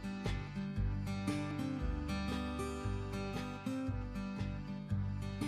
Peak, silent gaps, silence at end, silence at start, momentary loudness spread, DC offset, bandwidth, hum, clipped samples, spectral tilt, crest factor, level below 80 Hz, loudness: -24 dBFS; none; 0 s; 0 s; 3 LU; under 0.1%; 14 kHz; none; under 0.1%; -6.5 dB/octave; 14 dB; -46 dBFS; -40 LUFS